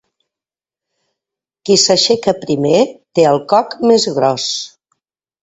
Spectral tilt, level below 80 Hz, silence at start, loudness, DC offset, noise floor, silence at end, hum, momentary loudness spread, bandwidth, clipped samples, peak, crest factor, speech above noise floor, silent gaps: -3.5 dB/octave; -58 dBFS; 1.65 s; -13 LUFS; under 0.1%; -89 dBFS; 0.75 s; none; 9 LU; 8.4 kHz; under 0.1%; 0 dBFS; 16 dB; 76 dB; none